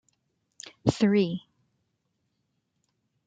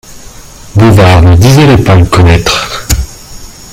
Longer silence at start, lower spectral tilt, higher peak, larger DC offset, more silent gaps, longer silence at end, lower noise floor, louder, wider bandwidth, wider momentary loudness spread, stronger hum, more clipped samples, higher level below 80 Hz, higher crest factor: first, 0.65 s vs 0.1 s; about the same, -6.5 dB/octave vs -5.5 dB/octave; second, -6 dBFS vs 0 dBFS; neither; neither; first, 1.9 s vs 0.2 s; first, -77 dBFS vs -28 dBFS; second, -26 LUFS vs -5 LUFS; second, 9 kHz vs 16 kHz; first, 23 LU vs 10 LU; neither; second, under 0.1% vs 4%; second, -60 dBFS vs -20 dBFS; first, 26 dB vs 6 dB